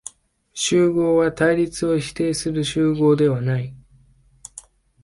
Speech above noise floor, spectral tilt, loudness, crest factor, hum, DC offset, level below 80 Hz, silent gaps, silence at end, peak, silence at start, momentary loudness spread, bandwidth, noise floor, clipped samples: 36 dB; -5.5 dB/octave; -20 LUFS; 16 dB; none; under 0.1%; -50 dBFS; none; 0.45 s; -6 dBFS; 0.55 s; 20 LU; 11.5 kHz; -54 dBFS; under 0.1%